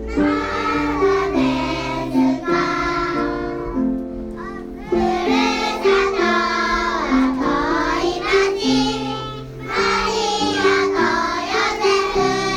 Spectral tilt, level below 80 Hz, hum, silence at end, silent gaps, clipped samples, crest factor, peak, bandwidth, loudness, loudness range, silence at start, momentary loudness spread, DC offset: -4.5 dB/octave; -38 dBFS; none; 0 s; none; under 0.1%; 16 dB; -4 dBFS; 12.5 kHz; -19 LUFS; 3 LU; 0 s; 8 LU; under 0.1%